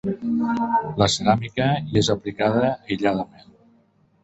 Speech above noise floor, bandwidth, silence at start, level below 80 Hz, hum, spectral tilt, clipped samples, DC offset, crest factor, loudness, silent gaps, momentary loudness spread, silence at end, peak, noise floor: 38 dB; 8.4 kHz; 0.05 s; -48 dBFS; none; -5.5 dB/octave; under 0.1%; under 0.1%; 20 dB; -22 LUFS; none; 4 LU; 1 s; -2 dBFS; -60 dBFS